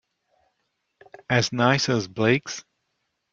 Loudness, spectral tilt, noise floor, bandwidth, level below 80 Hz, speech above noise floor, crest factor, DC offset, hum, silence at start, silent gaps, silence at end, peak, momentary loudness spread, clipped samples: -22 LUFS; -4.5 dB/octave; -76 dBFS; 7.6 kHz; -62 dBFS; 54 dB; 22 dB; under 0.1%; none; 1.3 s; none; 0.7 s; -4 dBFS; 10 LU; under 0.1%